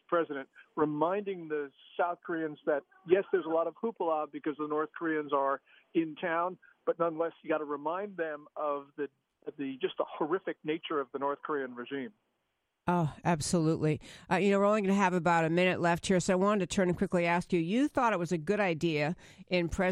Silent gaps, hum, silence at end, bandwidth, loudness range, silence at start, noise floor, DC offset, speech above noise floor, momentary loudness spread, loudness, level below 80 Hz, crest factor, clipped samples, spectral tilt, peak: none; none; 0 s; 13 kHz; 8 LU; 0.1 s; -82 dBFS; under 0.1%; 51 dB; 10 LU; -32 LUFS; -60 dBFS; 20 dB; under 0.1%; -6 dB/octave; -12 dBFS